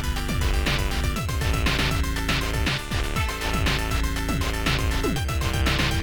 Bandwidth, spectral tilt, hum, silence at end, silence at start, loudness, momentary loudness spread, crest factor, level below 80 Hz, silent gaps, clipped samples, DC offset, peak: over 20 kHz; -4.5 dB/octave; none; 0 s; 0 s; -25 LUFS; 4 LU; 14 dB; -28 dBFS; none; under 0.1%; under 0.1%; -8 dBFS